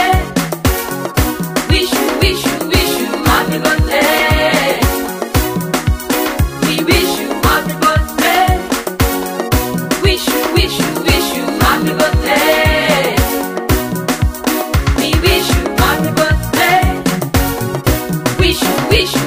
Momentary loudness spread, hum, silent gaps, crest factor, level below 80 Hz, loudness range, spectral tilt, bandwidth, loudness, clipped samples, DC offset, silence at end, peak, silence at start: 5 LU; none; none; 14 dB; -22 dBFS; 2 LU; -4.5 dB/octave; 16 kHz; -13 LUFS; under 0.1%; under 0.1%; 0 s; 0 dBFS; 0 s